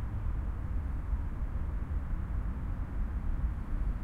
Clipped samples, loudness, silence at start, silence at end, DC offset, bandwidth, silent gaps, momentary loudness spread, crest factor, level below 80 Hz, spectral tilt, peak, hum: under 0.1%; -38 LUFS; 0 s; 0 s; under 0.1%; 3.6 kHz; none; 1 LU; 12 dB; -34 dBFS; -9 dB/octave; -22 dBFS; none